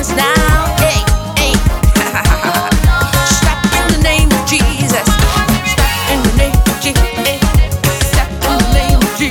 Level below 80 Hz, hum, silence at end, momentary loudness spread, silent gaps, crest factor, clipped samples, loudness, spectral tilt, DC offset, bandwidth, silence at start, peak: -16 dBFS; none; 0 s; 3 LU; none; 10 dB; under 0.1%; -12 LUFS; -4 dB/octave; under 0.1%; 19 kHz; 0 s; 0 dBFS